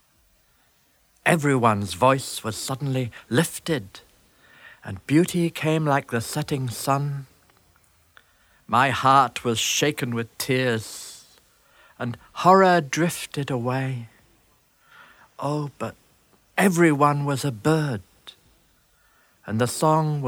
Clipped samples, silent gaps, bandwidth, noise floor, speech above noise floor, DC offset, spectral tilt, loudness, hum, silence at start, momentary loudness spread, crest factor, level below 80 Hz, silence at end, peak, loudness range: under 0.1%; none; 18 kHz; -63 dBFS; 40 dB; under 0.1%; -5 dB/octave; -23 LUFS; none; 1.25 s; 15 LU; 22 dB; -60 dBFS; 0 s; -2 dBFS; 4 LU